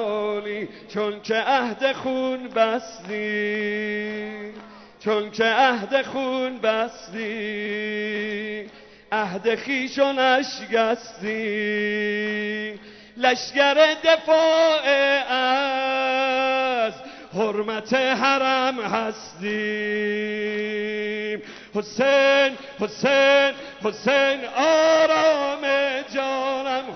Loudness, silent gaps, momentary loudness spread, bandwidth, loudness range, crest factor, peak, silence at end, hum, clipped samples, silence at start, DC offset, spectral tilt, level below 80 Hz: -22 LUFS; none; 13 LU; 6.4 kHz; 7 LU; 18 dB; -4 dBFS; 0 s; none; under 0.1%; 0 s; under 0.1%; -3.5 dB/octave; -66 dBFS